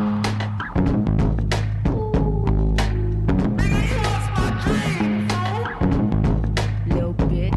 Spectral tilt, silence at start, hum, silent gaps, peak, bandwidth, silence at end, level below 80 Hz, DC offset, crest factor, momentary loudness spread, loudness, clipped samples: -7 dB/octave; 0 s; none; none; -10 dBFS; 12 kHz; 0 s; -26 dBFS; under 0.1%; 10 dB; 3 LU; -21 LUFS; under 0.1%